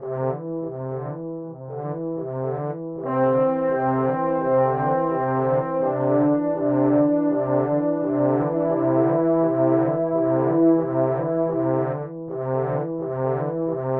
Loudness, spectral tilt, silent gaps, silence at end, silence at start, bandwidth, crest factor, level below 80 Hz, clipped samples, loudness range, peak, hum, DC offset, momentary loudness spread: -22 LUFS; -13 dB/octave; none; 0 s; 0 s; 3.3 kHz; 14 dB; -58 dBFS; under 0.1%; 4 LU; -6 dBFS; none; under 0.1%; 10 LU